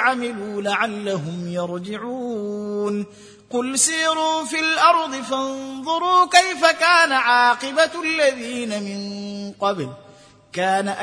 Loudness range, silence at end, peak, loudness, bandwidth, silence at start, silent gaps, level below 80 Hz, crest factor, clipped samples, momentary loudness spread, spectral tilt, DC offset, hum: 7 LU; 0 s; 0 dBFS; -20 LUFS; 10.5 kHz; 0 s; none; -68 dBFS; 20 dB; under 0.1%; 14 LU; -2.5 dB/octave; under 0.1%; none